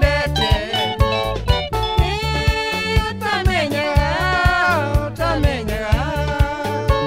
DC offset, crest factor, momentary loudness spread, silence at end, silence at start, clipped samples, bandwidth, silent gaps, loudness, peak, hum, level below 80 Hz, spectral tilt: 0.3%; 16 dB; 4 LU; 0 s; 0 s; under 0.1%; 16 kHz; none; -19 LUFS; -2 dBFS; none; -24 dBFS; -5.5 dB/octave